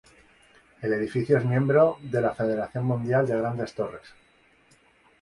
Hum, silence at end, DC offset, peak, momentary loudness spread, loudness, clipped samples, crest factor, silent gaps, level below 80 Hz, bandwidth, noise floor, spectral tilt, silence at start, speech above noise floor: none; 1.15 s; under 0.1%; -8 dBFS; 11 LU; -25 LUFS; under 0.1%; 20 dB; none; -60 dBFS; 11 kHz; -61 dBFS; -8.5 dB/octave; 0.8 s; 36 dB